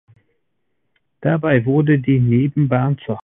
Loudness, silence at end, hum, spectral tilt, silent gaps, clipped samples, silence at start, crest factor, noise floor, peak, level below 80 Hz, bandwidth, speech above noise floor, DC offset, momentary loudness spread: -17 LUFS; 0 s; none; -13 dB/octave; none; under 0.1%; 1.2 s; 16 dB; -74 dBFS; -2 dBFS; -52 dBFS; 3.8 kHz; 58 dB; under 0.1%; 5 LU